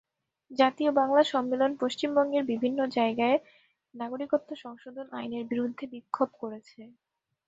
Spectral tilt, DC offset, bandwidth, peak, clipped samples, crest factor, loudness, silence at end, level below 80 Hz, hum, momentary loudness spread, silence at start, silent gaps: -5 dB/octave; under 0.1%; 8 kHz; -8 dBFS; under 0.1%; 20 dB; -28 LUFS; 0.6 s; -76 dBFS; none; 16 LU; 0.5 s; none